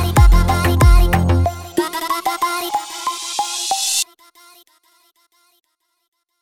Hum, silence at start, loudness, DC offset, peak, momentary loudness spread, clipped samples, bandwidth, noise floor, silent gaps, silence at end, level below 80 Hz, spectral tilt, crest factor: none; 0 s; -17 LUFS; under 0.1%; 0 dBFS; 10 LU; under 0.1%; 16.5 kHz; -59 dBFS; none; 2.4 s; -20 dBFS; -4.5 dB/octave; 16 dB